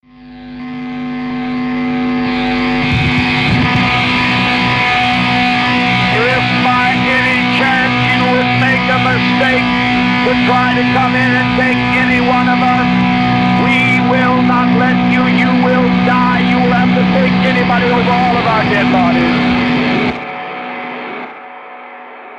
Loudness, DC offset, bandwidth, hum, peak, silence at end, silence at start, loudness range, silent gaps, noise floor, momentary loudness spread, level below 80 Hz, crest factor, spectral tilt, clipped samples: -11 LUFS; under 0.1%; 9.4 kHz; none; -4 dBFS; 0 s; 0.2 s; 3 LU; none; -33 dBFS; 12 LU; -36 dBFS; 8 dB; -6.5 dB/octave; under 0.1%